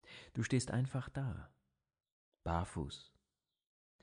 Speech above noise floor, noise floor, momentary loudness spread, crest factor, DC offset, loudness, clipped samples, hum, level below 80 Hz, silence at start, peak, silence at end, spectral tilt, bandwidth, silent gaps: 51 dB; -90 dBFS; 12 LU; 20 dB; under 0.1%; -40 LUFS; under 0.1%; none; -58 dBFS; 0.05 s; -22 dBFS; 1 s; -6 dB/octave; 10.5 kHz; 2.12-2.32 s